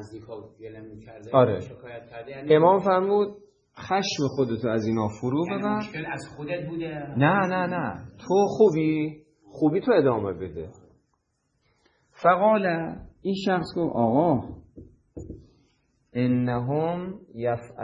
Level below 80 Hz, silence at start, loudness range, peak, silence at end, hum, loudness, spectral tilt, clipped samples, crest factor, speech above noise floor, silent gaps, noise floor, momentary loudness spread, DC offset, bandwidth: -58 dBFS; 0 s; 4 LU; -4 dBFS; 0 s; none; -24 LUFS; -7 dB/octave; under 0.1%; 22 dB; 49 dB; none; -73 dBFS; 21 LU; under 0.1%; 9.6 kHz